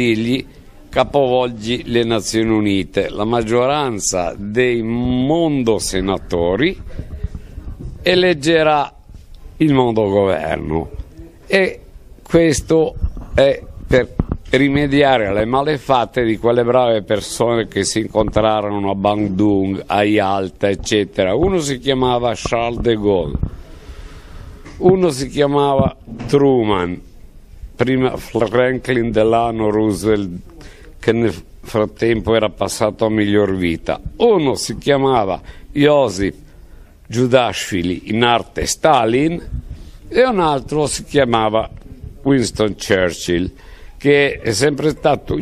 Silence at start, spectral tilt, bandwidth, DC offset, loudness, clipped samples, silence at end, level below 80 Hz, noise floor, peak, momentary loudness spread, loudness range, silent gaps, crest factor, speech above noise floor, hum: 0 s; -5 dB/octave; 15 kHz; under 0.1%; -16 LUFS; under 0.1%; 0 s; -34 dBFS; -40 dBFS; 0 dBFS; 9 LU; 2 LU; none; 16 dB; 24 dB; none